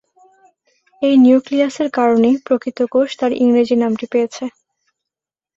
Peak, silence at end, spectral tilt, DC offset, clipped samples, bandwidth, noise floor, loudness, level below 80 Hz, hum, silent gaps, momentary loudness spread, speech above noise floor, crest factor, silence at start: -2 dBFS; 1.05 s; -5.5 dB/octave; under 0.1%; under 0.1%; 7.6 kHz; -87 dBFS; -15 LUFS; -62 dBFS; none; none; 9 LU; 73 dB; 14 dB; 1 s